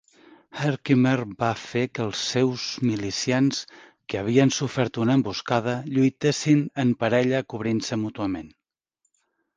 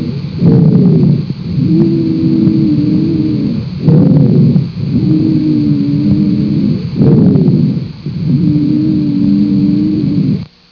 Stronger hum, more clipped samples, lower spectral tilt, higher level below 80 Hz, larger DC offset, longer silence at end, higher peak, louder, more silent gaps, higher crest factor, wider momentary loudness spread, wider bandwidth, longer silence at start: neither; second, under 0.1% vs 0.3%; second, -5.5 dB/octave vs -11 dB/octave; second, -60 dBFS vs -38 dBFS; neither; first, 1.1 s vs 0.25 s; second, -4 dBFS vs 0 dBFS; second, -24 LUFS vs -11 LUFS; neither; first, 20 dB vs 10 dB; about the same, 9 LU vs 7 LU; first, 9.8 kHz vs 5.4 kHz; first, 0.55 s vs 0 s